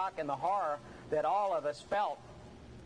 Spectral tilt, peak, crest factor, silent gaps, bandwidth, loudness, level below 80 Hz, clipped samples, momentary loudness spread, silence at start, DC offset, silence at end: -5 dB/octave; -22 dBFS; 14 dB; none; 11 kHz; -34 LUFS; -64 dBFS; under 0.1%; 19 LU; 0 s; under 0.1%; 0 s